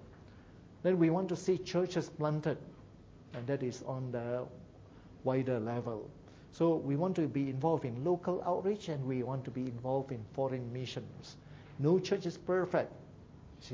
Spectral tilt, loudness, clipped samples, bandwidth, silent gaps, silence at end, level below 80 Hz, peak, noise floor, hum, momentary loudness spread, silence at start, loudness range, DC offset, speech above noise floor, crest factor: -7.5 dB/octave; -35 LUFS; under 0.1%; 8 kHz; none; 0 s; -64 dBFS; -18 dBFS; -56 dBFS; none; 20 LU; 0 s; 4 LU; under 0.1%; 21 dB; 18 dB